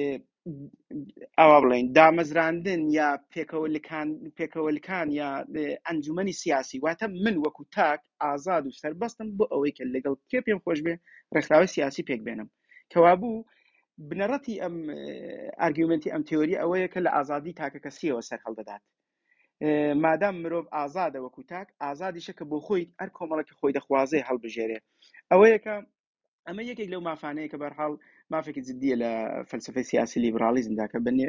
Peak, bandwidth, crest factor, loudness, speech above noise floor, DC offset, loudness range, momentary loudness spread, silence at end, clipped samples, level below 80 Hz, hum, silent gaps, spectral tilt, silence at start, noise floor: -4 dBFS; 7.6 kHz; 24 dB; -27 LUFS; 44 dB; under 0.1%; 9 LU; 18 LU; 0 s; under 0.1%; -68 dBFS; none; 26.00-26.15 s, 26.28-26.43 s; -6 dB/octave; 0 s; -70 dBFS